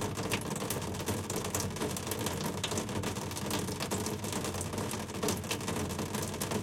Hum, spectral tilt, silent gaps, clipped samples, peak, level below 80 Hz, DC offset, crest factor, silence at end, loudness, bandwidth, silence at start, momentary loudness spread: none; -4 dB/octave; none; under 0.1%; -16 dBFS; -56 dBFS; under 0.1%; 20 dB; 0 s; -35 LUFS; 17 kHz; 0 s; 2 LU